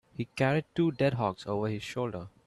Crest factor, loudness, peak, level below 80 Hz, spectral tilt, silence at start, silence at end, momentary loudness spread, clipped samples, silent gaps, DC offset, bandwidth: 18 dB; -31 LUFS; -12 dBFS; -62 dBFS; -7 dB/octave; 0.2 s; 0.2 s; 8 LU; under 0.1%; none; under 0.1%; 12.5 kHz